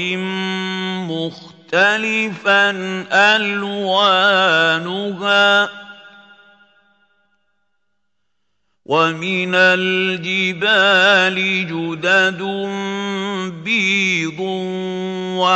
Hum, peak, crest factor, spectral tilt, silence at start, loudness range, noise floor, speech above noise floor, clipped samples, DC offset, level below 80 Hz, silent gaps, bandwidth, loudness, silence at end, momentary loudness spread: none; 0 dBFS; 16 dB; -4 dB/octave; 0 s; 6 LU; -75 dBFS; 59 dB; under 0.1%; under 0.1%; -70 dBFS; none; 8.4 kHz; -16 LUFS; 0 s; 11 LU